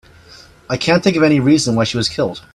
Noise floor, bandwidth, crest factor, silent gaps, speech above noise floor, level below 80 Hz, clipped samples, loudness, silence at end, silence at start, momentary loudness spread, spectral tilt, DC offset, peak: -43 dBFS; 12.5 kHz; 16 dB; none; 28 dB; -46 dBFS; under 0.1%; -15 LUFS; 0.15 s; 0.7 s; 8 LU; -5 dB/octave; under 0.1%; 0 dBFS